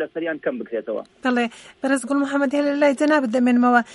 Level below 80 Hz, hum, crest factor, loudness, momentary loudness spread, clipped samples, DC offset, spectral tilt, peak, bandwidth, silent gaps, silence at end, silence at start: -70 dBFS; none; 18 dB; -21 LUFS; 11 LU; under 0.1%; under 0.1%; -4.5 dB/octave; -4 dBFS; 11.5 kHz; none; 0 s; 0 s